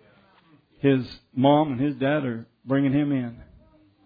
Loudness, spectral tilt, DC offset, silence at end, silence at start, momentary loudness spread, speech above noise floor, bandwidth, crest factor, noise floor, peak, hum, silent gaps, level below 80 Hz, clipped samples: -24 LUFS; -10 dB/octave; under 0.1%; 0.6 s; 0.85 s; 13 LU; 35 dB; 5 kHz; 18 dB; -58 dBFS; -8 dBFS; none; none; -58 dBFS; under 0.1%